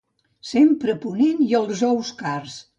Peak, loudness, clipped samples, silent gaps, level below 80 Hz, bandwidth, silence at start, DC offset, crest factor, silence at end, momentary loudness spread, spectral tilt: -6 dBFS; -21 LUFS; under 0.1%; none; -66 dBFS; 8.6 kHz; 0.45 s; under 0.1%; 14 dB; 0.15 s; 11 LU; -5.5 dB/octave